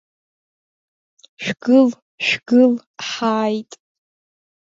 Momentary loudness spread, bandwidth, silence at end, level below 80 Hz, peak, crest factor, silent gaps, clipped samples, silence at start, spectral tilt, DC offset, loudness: 13 LU; 7.6 kHz; 1.15 s; -68 dBFS; -2 dBFS; 18 dB; 2.02-2.18 s, 2.87-2.94 s; under 0.1%; 1.4 s; -4.5 dB/octave; under 0.1%; -18 LUFS